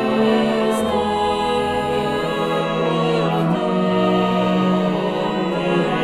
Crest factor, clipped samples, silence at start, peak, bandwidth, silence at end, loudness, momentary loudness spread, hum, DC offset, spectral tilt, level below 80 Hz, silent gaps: 12 dB; under 0.1%; 0 s; -6 dBFS; 14 kHz; 0 s; -19 LUFS; 3 LU; none; under 0.1%; -6.5 dB/octave; -48 dBFS; none